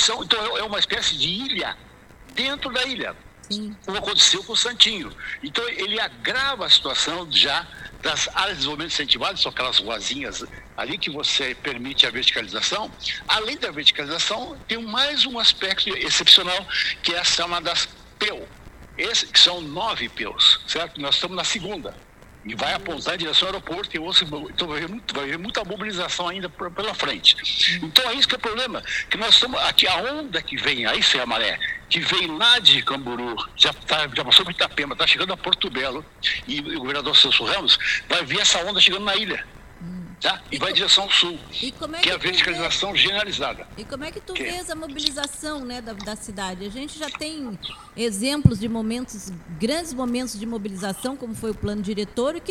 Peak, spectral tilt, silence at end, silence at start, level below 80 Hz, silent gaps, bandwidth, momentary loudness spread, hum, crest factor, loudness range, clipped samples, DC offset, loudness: 0 dBFS; -2 dB/octave; 0 s; 0 s; -48 dBFS; none; 19 kHz; 16 LU; none; 22 dB; 8 LU; under 0.1%; under 0.1%; -20 LUFS